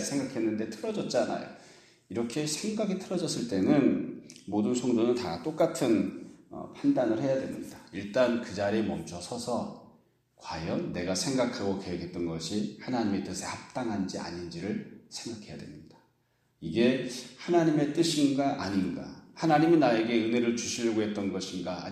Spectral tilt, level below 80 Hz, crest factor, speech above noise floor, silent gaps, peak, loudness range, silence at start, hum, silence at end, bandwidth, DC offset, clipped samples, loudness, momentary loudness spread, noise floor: -5 dB/octave; -64 dBFS; 20 dB; 42 dB; none; -10 dBFS; 7 LU; 0 s; none; 0 s; 14 kHz; under 0.1%; under 0.1%; -30 LUFS; 15 LU; -72 dBFS